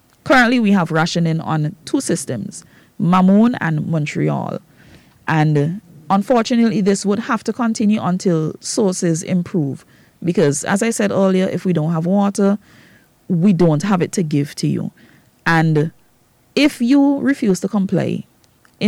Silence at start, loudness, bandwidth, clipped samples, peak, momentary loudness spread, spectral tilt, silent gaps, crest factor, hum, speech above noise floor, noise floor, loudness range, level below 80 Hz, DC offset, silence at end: 0.25 s; -17 LUFS; 14 kHz; under 0.1%; -6 dBFS; 10 LU; -6 dB/octave; none; 12 dB; none; 39 dB; -55 dBFS; 2 LU; -54 dBFS; under 0.1%; 0 s